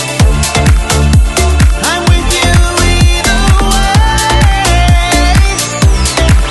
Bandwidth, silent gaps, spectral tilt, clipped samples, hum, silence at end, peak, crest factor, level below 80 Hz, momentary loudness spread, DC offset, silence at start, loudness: 12.5 kHz; none; -4 dB/octave; 0.3%; none; 0 s; 0 dBFS; 8 dB; -10 dBFS; 2 LU; under 0.1%; 0 s; -9 LUFS